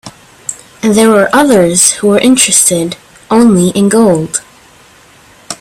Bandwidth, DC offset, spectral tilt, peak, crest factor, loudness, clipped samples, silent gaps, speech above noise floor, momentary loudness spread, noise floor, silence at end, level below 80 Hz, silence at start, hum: over 20 kHz; under 0.1%; -3.5 dB/octave; 0 dBFS; 10 dB; -8 LUFS; 0.2%; none; 33 dB; 17 LU; -41 dBFS; 0.05 s; -46 dBFS; 0.05 s; none